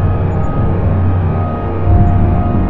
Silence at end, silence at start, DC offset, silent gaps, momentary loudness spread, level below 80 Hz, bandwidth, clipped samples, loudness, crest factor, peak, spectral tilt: 0 s; 0 s; under 0.1%; none; 5 LU; -20 dBFS; 3.6 kHz; under 0.1%; -14 LUFS; 12 dB; 0 dBFS; -11.5 dB/octave